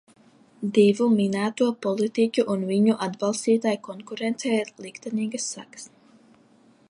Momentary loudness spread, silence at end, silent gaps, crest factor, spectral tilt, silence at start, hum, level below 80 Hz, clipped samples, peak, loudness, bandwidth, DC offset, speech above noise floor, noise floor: 16 LU; 1.05 s; none; 18 dB; -5.5 dB/octave; 0.6 s; none; -74 dBFS; under 0.1%; -6 dBFS; -24 LUFS; 11.5 kHz; under 0.1%; 34 dB; -57 dBFS